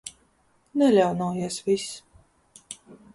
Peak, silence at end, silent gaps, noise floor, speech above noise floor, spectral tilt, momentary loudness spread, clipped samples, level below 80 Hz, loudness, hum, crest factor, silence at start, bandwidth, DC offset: -8 dBFS; 0.2 s; none; -65 dBFS; 42 dB; -5.5 dB/octave; 23 LU; under 0.1%; -64 dBFS; -24 LUFS; none; 20 dB; 0.05 s; 11.5 kHz; under 0.1%